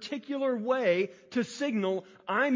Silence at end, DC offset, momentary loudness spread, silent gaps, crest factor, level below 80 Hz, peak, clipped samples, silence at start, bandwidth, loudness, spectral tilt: 0 s; under 0.1%; 7 LU; none; 16 dB; -82 dBFS; -14 dBFS; under 0.1%; 0 s; 7.6 kHz; -30 LUFS; -5.5 dB/octave